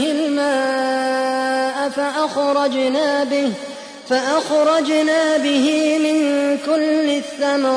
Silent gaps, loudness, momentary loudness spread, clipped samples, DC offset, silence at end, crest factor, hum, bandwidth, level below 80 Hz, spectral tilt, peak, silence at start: none; -18 LUFS; 5 LU; under 0.1%; under 0.1%; 0 s; 12 dB; none; 10.5 kHz; -66 dBFS; -3 dB/octave; -6 dBFS; 0 s